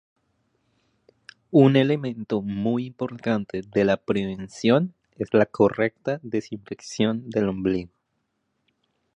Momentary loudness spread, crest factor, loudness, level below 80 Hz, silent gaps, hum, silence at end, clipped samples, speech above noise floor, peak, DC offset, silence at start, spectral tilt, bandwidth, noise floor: 13 LU; 20 dB; -24 LUFS; -58 dBFS; none; none; 1.3 s; under 0.1%; 52 dB; -4 dBFS; under 0.1%; 1.5 s; -7 dB/octave; 10 kHz; -75 dBFS